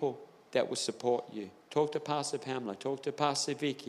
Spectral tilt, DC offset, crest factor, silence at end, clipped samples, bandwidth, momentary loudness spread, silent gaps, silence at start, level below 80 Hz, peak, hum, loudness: -4 dB/octave; under 0.1%; 22 dB; 0 s; under 0.1%; 13.5 kHz; 6 LU; none; 0 s; -86 dBFS; -14 dBFS; none; -34 LUFS